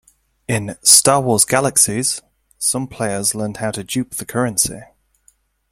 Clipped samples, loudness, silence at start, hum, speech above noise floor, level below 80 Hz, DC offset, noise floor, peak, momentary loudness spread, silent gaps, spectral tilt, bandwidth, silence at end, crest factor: under 0.1%; -16 LUFS; 0.5 s; none; 40 dB; -52 dBFS; under 0.1%; -58 dBFS; 0 dBFS; 14 LU; none; -2.5 dB/octave; 16.5 kHz; 0.85 s; 18 dB